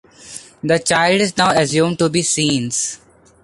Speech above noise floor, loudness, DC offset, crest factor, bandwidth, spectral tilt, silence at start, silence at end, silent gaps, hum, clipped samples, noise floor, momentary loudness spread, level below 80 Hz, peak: 22 dB; -16 LUFS; under 0.1%; 16 dB; 11.5 kHz; -3.5 dB/octave; 0.2 s; 0.5 s; none; none; under 0.1%; -38 dBFS; 20 LU; -52 dBFS; -2 dBFS